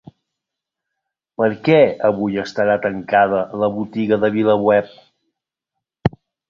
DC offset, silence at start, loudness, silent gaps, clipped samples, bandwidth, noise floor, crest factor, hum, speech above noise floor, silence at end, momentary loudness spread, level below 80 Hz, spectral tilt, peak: under 0.1%; 1.4 s; -17 LUFS; none; under 0.1%; 7.2 kHz; -83 dBFS; 18 dB; none; 66 dB; 0.4 s; 10 LU; -50 dBFS; -7.5 dB/octave; -2 dBFS